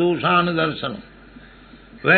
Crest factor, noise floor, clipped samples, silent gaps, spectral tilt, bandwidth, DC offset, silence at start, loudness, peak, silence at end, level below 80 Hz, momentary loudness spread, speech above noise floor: 20 dB; -45 dBFS; under 0.1%; none; -9 dB/octave; 4.5 kHz; under 0.1%; 0 s; -20 LUFS; -2 dBFS; 0 s; -52 dBFS; 13 LU; 25 dB